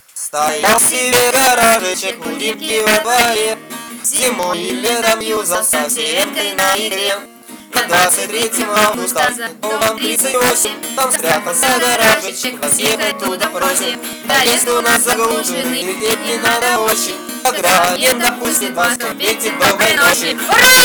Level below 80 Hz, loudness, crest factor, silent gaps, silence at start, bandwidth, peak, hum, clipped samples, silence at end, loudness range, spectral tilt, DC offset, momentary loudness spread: -50 dBFS; -13 LUFS; 14 dB; none; 0.15 s; over 20 kHz; 0 dBFS; none; under 0.1%; 0 s; 2 LU; -1 dB/octave; under 0.1%; 8 LU